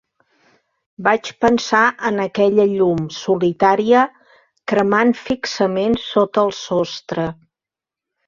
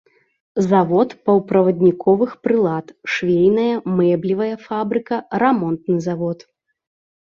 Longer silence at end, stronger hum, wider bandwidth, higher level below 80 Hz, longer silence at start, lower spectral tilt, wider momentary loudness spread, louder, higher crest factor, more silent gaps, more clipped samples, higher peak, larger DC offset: about the same, 0.95 s vs 0.95 s; neither; about the same, 7.4 kHz vs 7.2 kHz; about the same, -54 dBFS vs -58 dBFS; first, 1 s vs 0.55 s; second, -5.5 dB/octave vs -8 dB/octave; about the same, 8 LU vs 9 LU; about the same, -17 LUFS vs -18 LUFS; about the same, 16 dB vs 16 dB; neither; neither; about the same, -2 dBFS vs -2 dBFS; neither